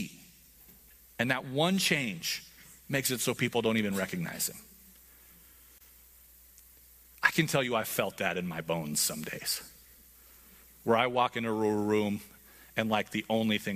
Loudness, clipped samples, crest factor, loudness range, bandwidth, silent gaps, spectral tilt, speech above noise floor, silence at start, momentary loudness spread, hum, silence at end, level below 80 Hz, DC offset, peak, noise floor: -30 LUFS; under 0.1%; 24 dB; 5 LU; 15.5 kHz; none; -3.5 dB/octave; 27 dB; 0 s; 11 LU; none; 0 s; -66 dBFS; under 0.1%; -8 dBFS; -57 dBFS